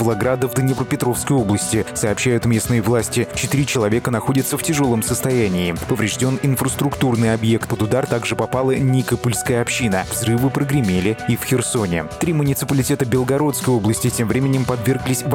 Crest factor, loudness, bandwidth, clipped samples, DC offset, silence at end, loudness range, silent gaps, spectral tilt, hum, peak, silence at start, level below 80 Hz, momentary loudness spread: 12 dB; -18 LUFS; 18.5 kHz; under 0.1%; under 0.1%; 0 s; 1 LU; none; -5.5 dB/octave; none; -6 dBFS; 0 s; -44 dBFS; 3 LU